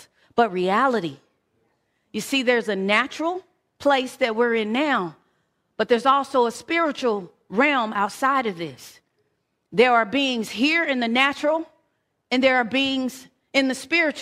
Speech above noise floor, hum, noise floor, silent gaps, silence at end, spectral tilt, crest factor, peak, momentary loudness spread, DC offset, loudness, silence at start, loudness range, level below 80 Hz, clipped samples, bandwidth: 51 dB; none; -72 dBFS; none; 0 s; -4 dB/octave; 20 dB; -4 dBFS; 10 LU; under 0.1%; -22 LUFS; 0.35 s; 2 LU; -68 dBFS; under 0.1%; 15.5 kHz